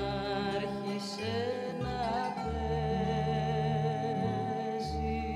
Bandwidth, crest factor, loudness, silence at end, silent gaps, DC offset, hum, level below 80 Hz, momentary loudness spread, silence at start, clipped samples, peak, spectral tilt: 11.5 kHz; 14 dB; -33 LUFS; 0 s; none; under 0.1%; none; -46 dBFS; 4 LU; 0 s; under 0.1%; -20 dBFS; -6.5 dB/octave